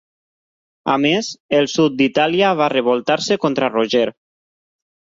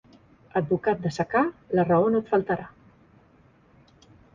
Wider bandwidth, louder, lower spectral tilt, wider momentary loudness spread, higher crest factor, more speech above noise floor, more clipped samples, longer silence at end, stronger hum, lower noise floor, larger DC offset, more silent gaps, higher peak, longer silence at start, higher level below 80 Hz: about the same, 7.8 kHz vs 7.6 kHz; first, -17 LUFS vs -25 LUFS; second, -4.5 dB/octave vs -8 dB/octave; second, 5 LU vs 9 LU; about the same, 16 dB vs 18 dB; first, over 73 dB vs 34 dB; neither; second, 0.95 s vs 1.65 s; neither; first, under -90 dBFS vs -58 dBFS; neither; first, 1.40-1.49 s vs none; first, -2 dBFS vs -10 dBFS; first, 0.85 s vs 0.55 s; about the same, -60 dBFS vs -60 dBFS